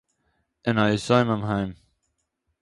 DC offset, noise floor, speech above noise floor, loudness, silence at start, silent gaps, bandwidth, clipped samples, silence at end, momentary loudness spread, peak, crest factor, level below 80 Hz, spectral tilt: under 0.1%; -76 dBFS; 54 dB; -24 LUFS; 0.65 s; none; 11.5 kHz; under 0.1%; 0.85 s; 10 LU; -6 dBFS; 20 dB; -54 dBFS; -6.5 dB/octave